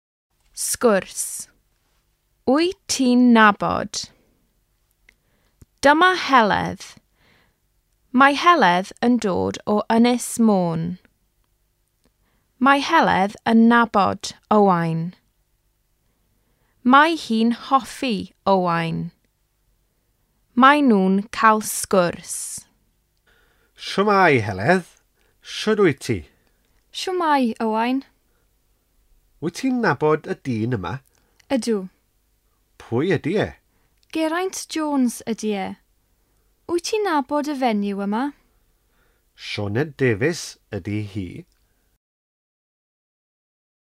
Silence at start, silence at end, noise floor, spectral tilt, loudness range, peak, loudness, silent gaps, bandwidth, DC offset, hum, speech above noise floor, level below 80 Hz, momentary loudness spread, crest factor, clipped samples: 0.55 s; 2.4 s; -67 dBFS; -4.5 dB/octave; 7 LU; -2 dBFS; -20 LUFS; none; 15 kHz; under 0.1%; none; 48 dB; -58 dBFS; 16 LU; 20 dB; under 0.1%